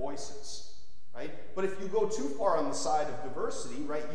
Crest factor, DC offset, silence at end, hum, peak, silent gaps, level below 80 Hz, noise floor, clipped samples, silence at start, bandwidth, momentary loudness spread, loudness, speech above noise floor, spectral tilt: 18 dB; 3%; 0 s; none; -14 dBFS; none; -62 dBFS; -59 dBFS; under 0.1%; 0 s; 11 kHz; 14 LU; -34 LUFS; 25 dB; -4 dB/octave